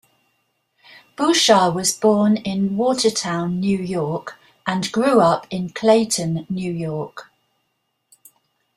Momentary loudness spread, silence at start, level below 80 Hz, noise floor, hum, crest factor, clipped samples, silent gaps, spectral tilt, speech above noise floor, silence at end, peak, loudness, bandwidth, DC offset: 12 LU; 1.2 s; -58 dBFS; -72 dBFS; none; 18 dB; under 0.1%; none; -4.5 dB/octave; 54 dB; 1.55 s; -2 dBFS; -19 LUFS; 14.5 kHz; under 0.1%